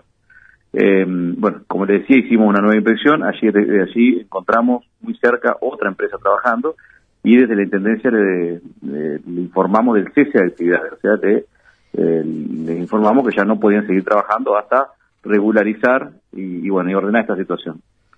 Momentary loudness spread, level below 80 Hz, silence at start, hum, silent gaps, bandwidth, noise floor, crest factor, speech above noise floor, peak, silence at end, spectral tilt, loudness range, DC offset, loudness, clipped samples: 11 LU; -62 dBFS; 0.75 s; none; none; 5 kHz; -49 dBFS; 16 dB; 34 dB; 0 dBFS; 0.4 s; -8.5 dB/octave; 3 LU; under 0.1%; -16 LUFS; under 0.1%